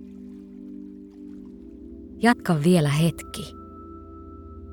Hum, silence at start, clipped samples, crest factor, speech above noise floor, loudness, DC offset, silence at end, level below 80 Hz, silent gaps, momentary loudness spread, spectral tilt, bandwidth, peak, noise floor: none; 0 s; under 0.1%; 22 dB; 21 dB; -22 LUFS; under 0.1%; 0 s; -50 dBFS; none; 23 LU; -6 dB/octave; 17.5 kHz; -4 dBFS; -42 dBFS